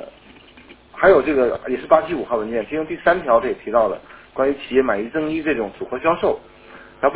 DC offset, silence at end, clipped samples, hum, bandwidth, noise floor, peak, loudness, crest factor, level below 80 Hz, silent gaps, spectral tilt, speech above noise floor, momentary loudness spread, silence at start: under 0.1%; 0 s; under 0.1%; none; 4 kHz; -46 dBFS; 0 dBFS; -19 LUFS; 20 dB; -48 dBFS; none; -9.5 dB/octave; 27 dB; 10 LU; 0 s